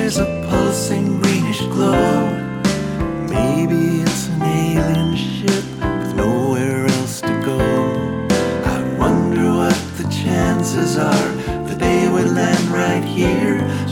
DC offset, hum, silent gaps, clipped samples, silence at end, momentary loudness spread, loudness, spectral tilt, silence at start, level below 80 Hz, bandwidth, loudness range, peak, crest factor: under 0.1%; none; none; under 0.1%; 0 s; 5 LU; -17 LUFS; -5.5 dB/octave; 0 s; -36 dBFS; 17.5 kHz; 1 LU; 0 dBFS; 16 dB